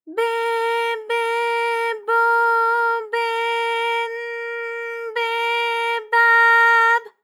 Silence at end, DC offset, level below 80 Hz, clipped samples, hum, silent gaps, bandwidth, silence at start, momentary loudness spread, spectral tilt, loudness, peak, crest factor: 0.15 s; under 0.1%; under -90 dBFS; under 0.1%; none; none; 16.5 kHz; 0.05 s; 14 LU; 2 dB/octave; -19 LUFS; -6 dBFS; 14 dB